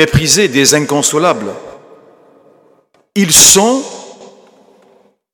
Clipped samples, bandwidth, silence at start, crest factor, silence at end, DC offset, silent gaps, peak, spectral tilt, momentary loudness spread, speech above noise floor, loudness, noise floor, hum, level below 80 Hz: 0.4%; over 20 kHz; 0 s; 14 dB; 1.1 s; under 0.1%; none; 0 dBFS; -2.5 dB/octave; 22 LU; 42 dB; -8 LUFS; -52 dBFS; none; -38 dBFS